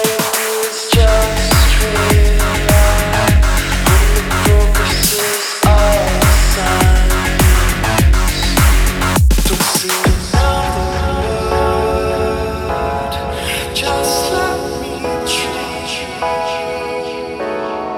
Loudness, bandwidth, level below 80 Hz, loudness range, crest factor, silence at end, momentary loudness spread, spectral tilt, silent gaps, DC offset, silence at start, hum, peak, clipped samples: -14 LUFS; over 20 kHz; -16 dBFS; 5 LU; 12 dB; 0 s; 9 LU; -4 dB/octave; none; under 0.1%; 0 s; none; 0 dBFS; under 0.1%